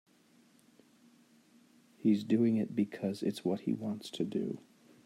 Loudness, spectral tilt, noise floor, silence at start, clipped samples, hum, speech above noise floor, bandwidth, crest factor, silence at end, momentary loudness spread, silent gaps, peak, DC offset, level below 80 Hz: -34 LUFS; -7 dB/octave; -66 dBFS; 2 s; under 0.1%; none; 33 dB; 13 kHz; 18 dB; 0.5 s; 9 LU; none; -18 dBFS; under 0.1%; -82 dBFS